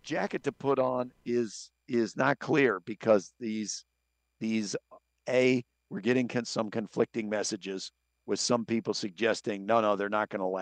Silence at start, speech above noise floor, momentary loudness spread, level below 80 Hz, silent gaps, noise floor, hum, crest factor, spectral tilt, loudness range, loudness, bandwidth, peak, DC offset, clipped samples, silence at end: 0.05 s; 50 dB; 11 LU; -76 dBFS; none; -80 dBFS; none; 20 dB; -4.5 dB/octave; 2 LU; -30 LUFS; 10 kHz; -10 dBFS; under 0.1%; under 0.1%; 0 s